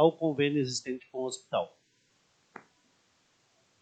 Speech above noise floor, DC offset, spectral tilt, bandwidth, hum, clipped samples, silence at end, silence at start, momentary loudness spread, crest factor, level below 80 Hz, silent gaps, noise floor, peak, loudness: 41 dB; under 0.1%; -5 dB/octave; 9 kHz; none; under 0.1%; 2.15 s; 0 s; 25 LU; 24 dB; -80 dBFS; none; -70 dBFS; -10 dBFS; -32 LUFS